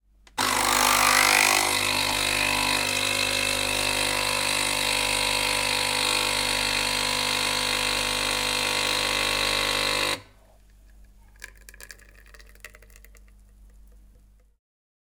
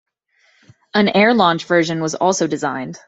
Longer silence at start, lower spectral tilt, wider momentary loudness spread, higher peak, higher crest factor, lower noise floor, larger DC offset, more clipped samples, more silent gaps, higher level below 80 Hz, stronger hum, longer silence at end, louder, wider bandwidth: second, 0.35 s vs 0.95 s; second, -0.5 dB/octave vs -4.5 dB/octave; second, 5 LU vs 9 LU; second, -6 dBFS vs 0 dBFS; about the same, 20 dB vs 16 dB; second, -55 dBFS vs -59 dBFS; neither; neither; neither; first, -46 dBFS vs -60 dBFS; first, 50 Hz at -45 dBFS vs none; first, 1.35 s vs 0.1 s; second, -22 LUFS vs -16 LUFS; first, 19 kHz vs 8 kHz